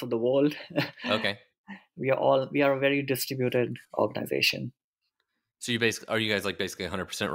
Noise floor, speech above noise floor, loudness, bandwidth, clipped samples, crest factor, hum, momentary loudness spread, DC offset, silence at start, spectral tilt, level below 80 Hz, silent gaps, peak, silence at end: -81 dBFS; 53 dB; -27 LUFS; 16 kHz; under 0.1%; 18 dB; none; 11 LU; under 0.1%; 0 s; -4.5 dB/octave; -68 dBFS; 1.58-1.64 s, 4.84-4.93 s; -10 dBFS; 0 s